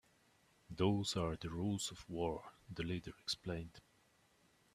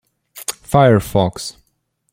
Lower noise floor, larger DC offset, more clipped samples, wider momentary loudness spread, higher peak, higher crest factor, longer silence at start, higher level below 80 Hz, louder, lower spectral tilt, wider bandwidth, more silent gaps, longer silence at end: first, -73 dBFS vs -67 dBFS; neither; neither; second, 13 LU vs 16 LU; second, -20 dBFS vs -2 dBFS; first, 22 dB vs 16 dB; first, 0.7 s vs 0.35 s; second, -62 dBFS vs -42 dBFS; second, -41 LUFS vs -16 LUFS; about the same, -5 dB/octave vs -6 dB/octave; second, 14.5 kHz vs 16.5 kHz; neither; first, 0.95 s vs 0.6 s